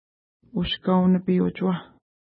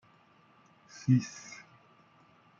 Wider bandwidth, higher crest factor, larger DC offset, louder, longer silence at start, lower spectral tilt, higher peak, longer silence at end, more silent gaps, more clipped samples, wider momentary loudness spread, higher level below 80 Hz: second, 5 kHz vs 7.6 kHz; second, 14 dB vs 22 dB; neither; first, -24 LUFS vs -31 LUFS; second, 0.55 s vs 1.05 s; first, -11.5 dB/octave vs -6.5 dB/octave; first, -10 dBFS vs -14 dBFS; second, 0.5 s vs 1.2 s; neither; neither; second, 11 LU vs 22 LU; first, -50 dBFS vs -76 dBFS